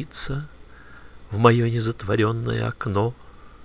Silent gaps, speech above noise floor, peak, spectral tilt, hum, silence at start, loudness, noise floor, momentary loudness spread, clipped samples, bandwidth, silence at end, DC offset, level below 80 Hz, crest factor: none; 23 dB; -2 dBFS; -11.5 dB/octave; none; 0 s; -23 LUFS; -45 dBFS; 14 LU; under 0.1%; 4 kHz; 0.15 s; 0.4%; -44 dBFS; 22 dB